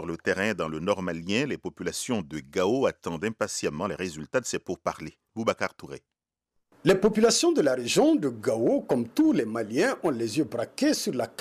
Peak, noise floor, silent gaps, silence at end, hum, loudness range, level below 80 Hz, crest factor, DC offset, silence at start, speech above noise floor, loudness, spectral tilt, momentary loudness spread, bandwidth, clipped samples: -8 dBFS; -78 dBFS; none; 0.1 s; none; 7 LU; -60 dBFS; 18 dB; under 0.1%; 0 s; 52 dB; -27 LUFS; -4.5 dB/octave; 11 LU; 15.5 kHz; under 0.1%